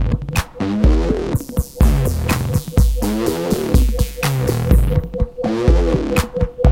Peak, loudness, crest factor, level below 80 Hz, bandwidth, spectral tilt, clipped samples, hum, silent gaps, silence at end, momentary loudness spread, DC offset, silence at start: -2 dBFS; -18 LUFS; 14 dB; -20 dBFS; 17 kHz; -6.5 dB/octave; under 0.1%; none; none; 0 s; 6 LU; under 0.1%; 0 s